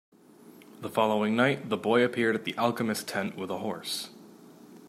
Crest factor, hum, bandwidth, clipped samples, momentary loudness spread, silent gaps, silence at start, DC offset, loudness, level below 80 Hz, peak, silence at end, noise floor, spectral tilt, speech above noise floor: 20 dB; none; 15.5 kHz; under 0.1%; 9 LU; none; 0.45 s; under 0.1%; -28 LUFS; -76 dBFS; -10 dBFS; 0 s; -53 dBFS; -4.5 dB/octave; 25 dB